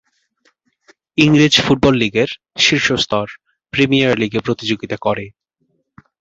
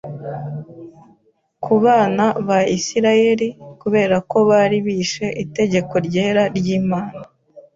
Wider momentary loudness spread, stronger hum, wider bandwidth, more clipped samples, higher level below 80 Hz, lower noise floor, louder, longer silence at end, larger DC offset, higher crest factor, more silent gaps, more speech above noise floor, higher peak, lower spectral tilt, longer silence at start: second, 11 LU vs 15 LU; neither; about the same, 8 kHz vs 7.6 kHz; neither; first, -46 dBFS vs -56 dBFS; first, -66 dBFS vs -59 dBFS; about the same, -15 LUFS vs -17 LUFS; first, 0.9 s vs 0.15 s; neither; about the same, 18 dB vs 14 dB; neither; first, 51 dB vs 42 dB; about the same, 0 dBFS vs -2 dBFS; about the same, -4.5 dB/octave vs -5.5 dB/octave; first, 1.15 s vs 0.05 s